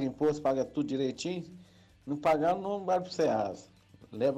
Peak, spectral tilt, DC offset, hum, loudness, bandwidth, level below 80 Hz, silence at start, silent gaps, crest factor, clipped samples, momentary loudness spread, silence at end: -20 dBFS; -6 dB/octave; under 0.1%; none; -31 LUFS; 13 kHz; -66 dBFS; 0 s; none; 12 dB; under 0.1%; 16 LU; 0 s